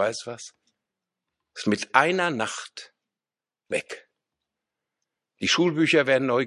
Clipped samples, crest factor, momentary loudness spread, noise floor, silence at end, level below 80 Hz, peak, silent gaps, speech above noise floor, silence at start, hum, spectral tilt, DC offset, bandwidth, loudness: under 0.1%; 26 dB; 21 LU; under -90 dBFS; 0 s; -68 dBFS; 0 dBFS; none; over 66 dB; 0 s; none; -4 dB/octave; under 0.1%; 11.5 kHz; -23 LUFS